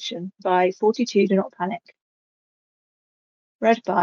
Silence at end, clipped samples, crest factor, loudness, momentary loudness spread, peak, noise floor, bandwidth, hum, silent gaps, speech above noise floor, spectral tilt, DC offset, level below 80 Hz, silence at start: 0 s; under 0.1%; 18 dB; -22 LUFS; 10 LU; -6 dBFS; under -90 dBFS; 7.2 kHz; none; 2.01-3.59 s; over 69 dB; -5.5 dB/octave; under 0.1%; -76 dBFS; 0 s